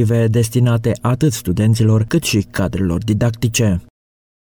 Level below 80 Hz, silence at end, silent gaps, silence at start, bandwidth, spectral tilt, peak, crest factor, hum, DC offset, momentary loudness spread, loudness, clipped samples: -38 dBFS; 0.8 s; none; 0 s; 19 kHz; -6 dB/octave; -4 dBFS; 12 dB; none; under 0.1%; 4 LU; -16 LUFS; under 0.1%